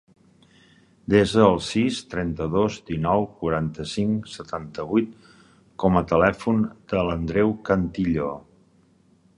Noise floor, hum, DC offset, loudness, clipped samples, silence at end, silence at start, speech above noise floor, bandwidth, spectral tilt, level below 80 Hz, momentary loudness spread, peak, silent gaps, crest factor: -59 dBFS; none; under 0.1%; -23 LUFS; under 0.1%; 1 s; 1.1 s; 37 dB; 11 kHz; -6.5 dB/octave; -44 dBFS; 12 LU; -2 dBFS; none; 22 dB